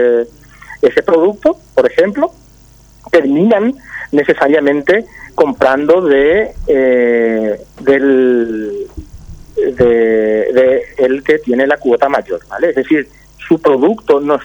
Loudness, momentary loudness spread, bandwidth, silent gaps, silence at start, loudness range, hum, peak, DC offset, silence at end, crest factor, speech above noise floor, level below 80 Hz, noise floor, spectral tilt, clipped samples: -12 LUFS; 8 LU; over 20 kHz; none; 0 s; 2 LU; none; 0 dBFS; under 0.1%; 0 s; 12 dB; 31 dB; -40 dBFS; -42 dBFS; -7 dB/octave; under 0.1%